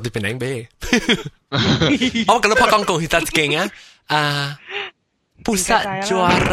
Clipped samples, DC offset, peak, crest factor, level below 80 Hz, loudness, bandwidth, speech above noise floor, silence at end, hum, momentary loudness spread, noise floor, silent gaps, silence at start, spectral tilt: under 0.1%; under 0.1%; 0 dBFS; 18 dB; -40 dBFS; -18 LUFS; 16 kHz; 40 dB; 0 s; none; 12 LU; -58 dBFS; none; 0 s; -4 dB/octave